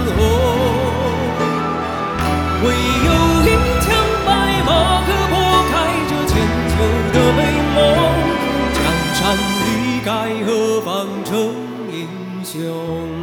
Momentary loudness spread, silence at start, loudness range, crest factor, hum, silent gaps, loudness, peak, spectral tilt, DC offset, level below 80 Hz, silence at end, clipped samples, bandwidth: 10 LU; 0 s; 4 LU; 16 dB; none; none; -16 LUFS; 0 dBFS; -5 dB/octave; under 0.1%; -26 dBFS; 0 s; under 0.1%; over 20 kHz